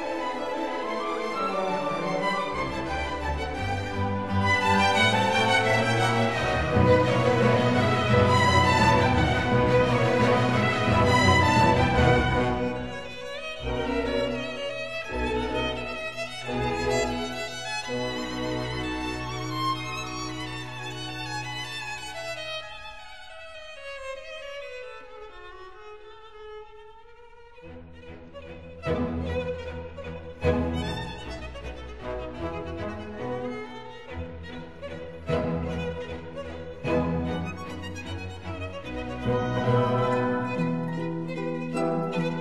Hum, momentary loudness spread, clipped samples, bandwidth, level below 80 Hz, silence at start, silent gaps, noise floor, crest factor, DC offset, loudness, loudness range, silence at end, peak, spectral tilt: none; 19 LU; under 0.1%; 12.5 kHz; -42 dBFS; 0 s; none; -50 dBFS; 20 dB; 0.5%; -26 LUFS; 16 LU; 0 s; -6 dBFS; -5.5 dB/octave